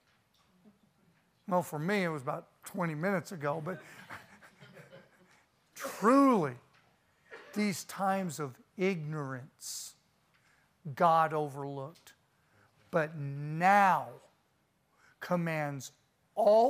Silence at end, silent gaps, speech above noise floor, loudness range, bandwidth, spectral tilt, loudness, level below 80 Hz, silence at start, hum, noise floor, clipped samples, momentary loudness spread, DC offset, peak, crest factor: 0 s; none; 43 dB; 6 LU; 15.5 kHz; -6 dB/octave; -32 LUFS; -82 dBFS; 1.5 s; none; -74 dBFS; under 0.1%; 22 LU; under 0.1%; -12 dBFS; 22 dB